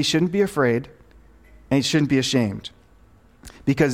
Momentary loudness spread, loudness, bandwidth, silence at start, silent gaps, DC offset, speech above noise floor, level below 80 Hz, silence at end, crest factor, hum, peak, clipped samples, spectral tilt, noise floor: 13 LU; -21 LUFS; 16 kHz; 0 s; none; 0.1%; 32 dB; -50 dBFS; 0 s; 16 dB; none; -6 dBFS; under 0.1%; -5 dB/octave; -53 dBFS